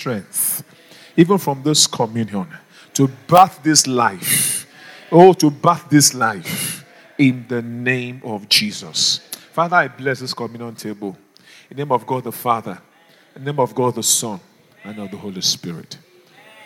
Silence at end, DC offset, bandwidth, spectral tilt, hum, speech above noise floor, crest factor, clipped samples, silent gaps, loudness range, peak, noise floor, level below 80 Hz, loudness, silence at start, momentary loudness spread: 0.7 s; under 0.1%; 19 kHz; -3.5 dB/octave; none; 31 dB; 18 dB; under 0.1%; none; 8 LU; 0 dBFS; -48 dBFS; -66 dBFS; -17 LUFS; 0 s; 19 LU